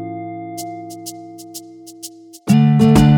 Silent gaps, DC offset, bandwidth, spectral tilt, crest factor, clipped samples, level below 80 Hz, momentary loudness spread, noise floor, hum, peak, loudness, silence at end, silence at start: none; under 0.1%; 18 kHz; -7 dB/octave; 16 dB; under 0.1%; -36 dBFS; 23 LU; -37 dBFS; none; 0 dBFS; -15 LUFS; 0 s; 0 s